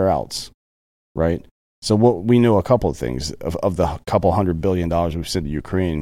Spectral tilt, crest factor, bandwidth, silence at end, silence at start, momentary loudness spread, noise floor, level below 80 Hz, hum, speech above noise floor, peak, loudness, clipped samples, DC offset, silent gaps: -6.5 dB/octave; 16 dB; 15.5 kHz; 0 s; 0 s; 12 LU; under -90 dBFS; -36 dBFS; none; over 71 dB; -4 dBFS; -20 LUFS; under 0.1%; under 0.1%; 0.54-1.15 s, 1.51-1.82 s